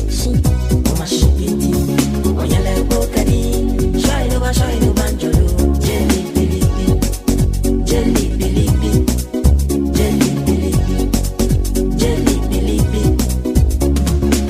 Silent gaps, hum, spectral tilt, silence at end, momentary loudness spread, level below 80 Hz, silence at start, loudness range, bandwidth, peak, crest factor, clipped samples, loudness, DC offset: none; none; -6 dB/octave; 0 s; 2 LU; -18 dBFS; 0 s; 1 LU; 16 kHz; 0 dBFS; 14 dB; under 0.1%; -16 LUFS; under 0.1%